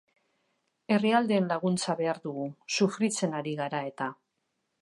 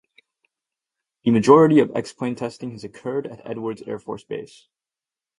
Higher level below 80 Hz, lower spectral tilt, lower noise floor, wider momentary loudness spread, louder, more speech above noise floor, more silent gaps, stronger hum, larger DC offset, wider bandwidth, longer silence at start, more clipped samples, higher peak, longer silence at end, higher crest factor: second, -80 dBFS vs -62 dBFS; second, -5 dB/octave vs -7 dB/octave; second, -80 dBFS vs under -90 dBFS; second, 11 LU vs 20 LU; second, -29 LUFS vs -20 LUFS; second, 51 dB vs over 70 dB; neither; neither; neither; about the same, 11.5 kHz vs 11 kHz; second, 0.9 s vs 1.25 s; neither; second, -10 dBFS vs 0 dBFS; second, 0.7 s vs 0.95 s; about the same, 20 dB vs 22 dB